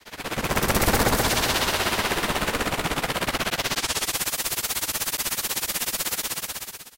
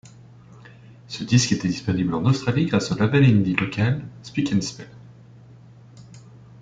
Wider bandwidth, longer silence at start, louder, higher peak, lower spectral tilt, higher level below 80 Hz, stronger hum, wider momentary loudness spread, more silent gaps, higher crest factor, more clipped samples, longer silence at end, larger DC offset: first, 17 kHz vs 9.2 kHz; second, 0.05 s vs 0.65 s; second, -24 LUFS vs -21 LUFS; second, -8 dBFS vs -2 dBFS; second, -2.5 dB/octave vs -6 dB/octave; first, -38 dBFS vs -52 dBFS; neither; second, 5 LU vs 15 LU; neither; about the same, 18 dB vs 20 dB; neither; second, 0.1 s vs 0.25 s; neither